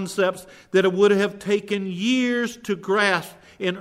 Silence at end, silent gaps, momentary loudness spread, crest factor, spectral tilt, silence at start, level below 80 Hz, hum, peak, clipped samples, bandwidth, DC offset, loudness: 0 s; none; 10 LU; 16 dB; -5 dB/octave; 0 s; -66 dBFS; none; -6 dBFS; under 0.1%; 15 kHz; under 0.1%; -22 LUFS